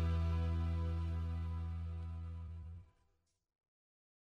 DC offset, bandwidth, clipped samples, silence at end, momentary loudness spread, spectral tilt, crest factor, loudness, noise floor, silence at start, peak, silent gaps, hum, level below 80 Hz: under 0.1%; 5.2 kHz; under 0.1%; 1.45 s; 13 LU; -8.5 dB/octave; 14 dB; -41 LUFS; -80 dBFS; 0 s; -28 dBFS; none; none; -46 dBFS